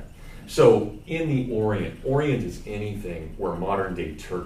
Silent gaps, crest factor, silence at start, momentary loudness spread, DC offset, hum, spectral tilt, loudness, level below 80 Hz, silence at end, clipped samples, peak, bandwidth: none; 20 dB; 0 s; 15 LU; under 0.1%; none; -7 dB/octave; -25 LUFS; -42 dBFS; 0 s; under 0.1%; -4 dBFS; 15 kHz